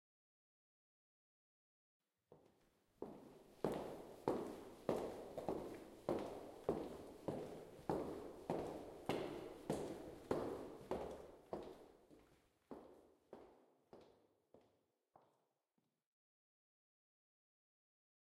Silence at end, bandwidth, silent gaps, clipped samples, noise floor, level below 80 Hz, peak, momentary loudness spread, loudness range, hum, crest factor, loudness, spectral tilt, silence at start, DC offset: 3.15 s; 16 kHz; none; under 0.1%; -89 dBFS; -72 dBFS; -24 dBFS; 18 LU; 18 LU; none; 28 dB; -48 LUFS; -6.5 dB/octave; 2.3 s; under 0.1%